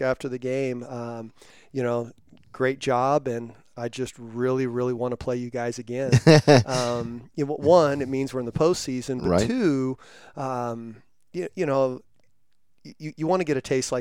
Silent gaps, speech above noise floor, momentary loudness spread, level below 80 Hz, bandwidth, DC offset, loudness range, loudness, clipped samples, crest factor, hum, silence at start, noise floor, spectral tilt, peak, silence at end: none; 48 dB; 17 LU; -54 dBFS; 16 kHz; 0.2%; 8 LU; -24 LUFS; under 0.1%; 22 dB; none; 0 s; -72 dBFS; -6 dB/octave; -2 dBFS; 0 s